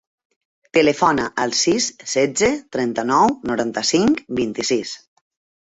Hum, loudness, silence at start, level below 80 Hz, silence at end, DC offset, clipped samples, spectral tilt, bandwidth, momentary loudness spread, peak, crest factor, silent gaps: none; -19 LUFS; 0.75 s; -54 dBFS; 0.65 s; under 0.1%; under 0.1%; -3 dB/octave; 8.4 kHz; 7 LU; -2 dBFS; 18 dB; none